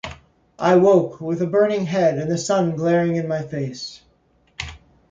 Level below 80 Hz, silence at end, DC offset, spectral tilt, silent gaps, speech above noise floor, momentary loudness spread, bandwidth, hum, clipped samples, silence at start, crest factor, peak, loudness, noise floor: -50 dBFS; 0.35 s; under 0.1%; -6 dB/octave; none; 41 dB; 17 LU; 9.2 kHz; none; under 0.1%; 0.05 s; 16 dB; -4 dBFS; -19 LUFS; -60 dBFS